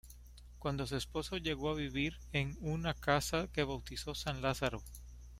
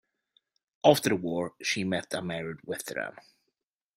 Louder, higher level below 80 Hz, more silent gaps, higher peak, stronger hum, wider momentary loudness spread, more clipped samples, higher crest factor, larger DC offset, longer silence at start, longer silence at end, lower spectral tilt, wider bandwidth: second, -37 LUFS vs -29 LUFS; first, -50 dBFS vs -70 dBFS; neither; second, -16 dBFS vs -6 dBFS; first, 60 Hz at -50 dBFS vs none; about the same, 15 LU vs 13 LU; neither; about the same, 22 dB vs 26 dB; neither; second, 0.05 s vs 0.85 s; second, 0 s vs 0.75 s; about the same, -5 dB/octave vs -4.5 dB/octave; about the same, 16 kHz vs 16 kHz